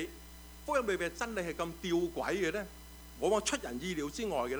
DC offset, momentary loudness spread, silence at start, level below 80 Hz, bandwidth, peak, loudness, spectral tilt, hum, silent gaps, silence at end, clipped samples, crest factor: under 0.1%; 15 LU; 0 s; -54 dBFS; over 20 kHz; -18 dBFS; -35 LUFS; -4 dB/octave; none; none; 0 s; under 0.1%; 18 dB